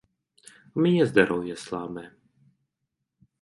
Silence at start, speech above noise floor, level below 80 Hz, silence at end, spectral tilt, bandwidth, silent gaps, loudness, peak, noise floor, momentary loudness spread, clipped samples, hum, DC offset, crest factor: 0.75 s; 58 dB; -64 dBFS; 1.35 s; -6.5 dB/octave; 11.5 kHz; none; -25 LUFS; -4 dBFS; -82 dBFS; 16 LU; under 0.1%; none; under 0.1%; 24 dB